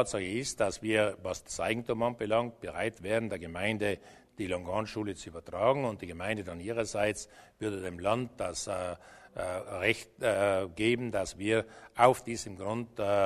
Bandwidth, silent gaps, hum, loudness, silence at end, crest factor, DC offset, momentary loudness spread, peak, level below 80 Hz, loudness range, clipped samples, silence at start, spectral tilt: 13.5 kHz; none; none; -32 LUFS; 0 s; 24 dB; under 0.1%; 10 LU; -8 dBFS; -60 dBFS; 5 LU; under 0.1%; 0 s; -4.5 dB/octave